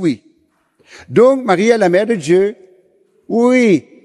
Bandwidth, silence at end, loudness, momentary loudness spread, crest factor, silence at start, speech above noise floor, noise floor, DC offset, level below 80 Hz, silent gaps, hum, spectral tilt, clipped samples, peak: 11.5 kHz; 0.25 s; -13 LUFS; 9 LU; 14 dB; 0 s; 46 dB; -58 dBFS; under 0.1%; -62 dBFS; none; none; -6 dB/octave; under 0.1%; 0 dBFS